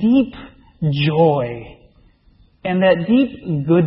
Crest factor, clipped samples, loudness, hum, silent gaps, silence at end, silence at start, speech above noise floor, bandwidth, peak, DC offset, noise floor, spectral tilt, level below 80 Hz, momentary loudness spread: 16 dB; under 0.1%; -18 LUFS; none; none; 0 s; 0 s; 37 dB; 5.8 kHz; -2 dBFS; under 0.1%; -53 dBFS; -12.5 dB/octave; -48 dBFS; 13 LU